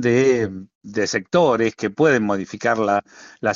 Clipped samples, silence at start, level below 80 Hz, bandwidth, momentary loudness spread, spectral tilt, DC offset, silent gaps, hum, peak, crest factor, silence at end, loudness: under 0.1%; 0 s; -58 dBFS; 7.6 kHz; 9 LU; -4.5 dB/octave; under 0.1%; 0.75-0.81 s; none; -4 dBFS; 16 dB; 0 s; -20 LUFS